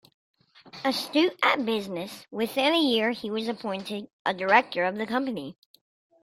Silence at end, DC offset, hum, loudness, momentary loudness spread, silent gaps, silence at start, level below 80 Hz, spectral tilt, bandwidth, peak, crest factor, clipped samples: 0.7 s; under 0.1%; none; -26 LUFS; 14 LU; 4.13-4.25 s; 0.65 s; -72 dBFS; -4 dB/octave; 16 kHz; -6 dBFS; 22 dB; under 0.1%